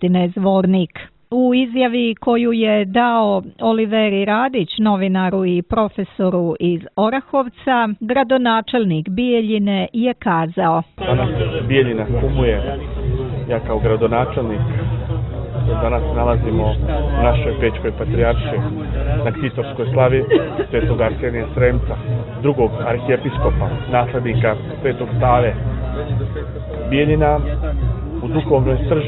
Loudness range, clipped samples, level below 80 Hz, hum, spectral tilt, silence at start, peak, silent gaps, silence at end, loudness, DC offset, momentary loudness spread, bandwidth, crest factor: 3 LU; under 0.1%; -26 dBFS; none; -11.5 dB/octave; 0 s; 0 dBFS; none; 0 s; -18 LUFS; under 0.1%; 7 LU; 4.2 kHz; 16 dB